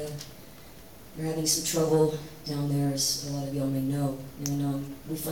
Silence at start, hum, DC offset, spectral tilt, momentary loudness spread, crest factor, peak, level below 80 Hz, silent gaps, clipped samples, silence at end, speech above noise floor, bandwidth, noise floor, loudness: 0 s; none; 0.2%; -4.5 dB/octave; 21 LU; 18 dB; -12 dBFS; -56 dBFS; none; under 0.1%; 0 s; 20 dB; 19 kHz; -49 dBFS; -29 LUFS